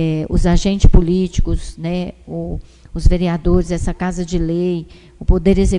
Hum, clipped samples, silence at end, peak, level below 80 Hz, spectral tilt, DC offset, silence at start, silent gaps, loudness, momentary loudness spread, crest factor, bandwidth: none; 0.6%; 0 s; 0 dBFS; -18 dBFS; -7 dB/octave; under 0.1%; 0 s; none; -18 LUFS; 12 LU; 14 dB; 10.5 kHz